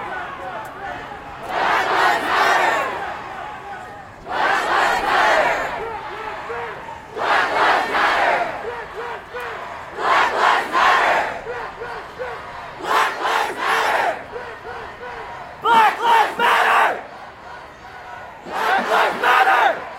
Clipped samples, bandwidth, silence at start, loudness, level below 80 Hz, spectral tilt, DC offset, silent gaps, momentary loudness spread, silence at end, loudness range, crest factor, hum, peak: under 0.1%; 16.5 kHz; 0 s; -18 LUFS; -52 dBFS; -2.5 dB/octave; under 0.1%; none; 18 LU; 0 s; 3 LU; 18 dB; none; -2 dBFS